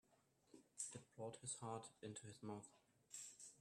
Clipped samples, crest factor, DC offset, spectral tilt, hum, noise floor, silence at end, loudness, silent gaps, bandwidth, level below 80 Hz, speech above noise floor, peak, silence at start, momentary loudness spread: under 0.1%; 22 dB; under 0.1%; -3.5 dB/octave; none; -80 dBFS; 0 s; -54 LUFS; none; 13 kHz; -90 dBFS; 25 dB; -34 dBFS; 0.1 s; 7 LU